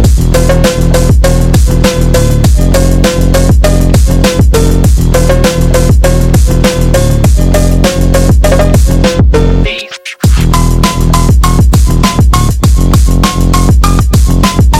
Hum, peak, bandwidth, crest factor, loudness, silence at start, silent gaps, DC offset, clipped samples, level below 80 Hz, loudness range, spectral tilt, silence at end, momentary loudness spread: none; 0 dBFS; 16 kHz; 6 dB; -8 LUFS; 0 s; none; 0.8%; 0.3%; -8 dBFS; 1 LU; -6 dB/octave; 0 s; 2 LU